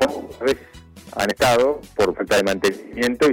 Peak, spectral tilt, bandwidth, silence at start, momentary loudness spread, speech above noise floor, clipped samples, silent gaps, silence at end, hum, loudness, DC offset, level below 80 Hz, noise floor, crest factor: -4 dBFS; -4 dB/octave; 18 kHz; 0 s; 8 LU; 24 dB; under 0.1%; none; 0 s; none; -20 LUFS; under 0.1%; -48 dBFS; -43 dBFS; 16 dB